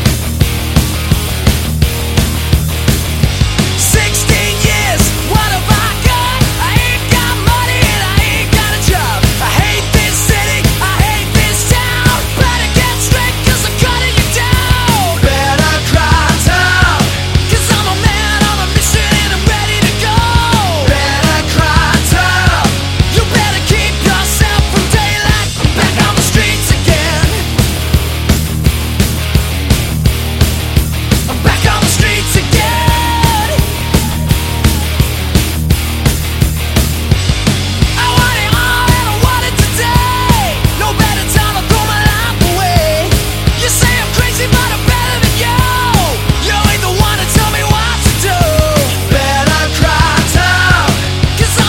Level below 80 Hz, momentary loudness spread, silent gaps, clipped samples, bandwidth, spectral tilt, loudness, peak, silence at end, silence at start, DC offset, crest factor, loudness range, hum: -18 dBFS; 4 LU; none; 0.3%; 17 kHz; -4 dB/octave; -11 LUFS; 0 dBFS; 0 s; 0 s; under 0.1%; 10 dB; 2 LU; none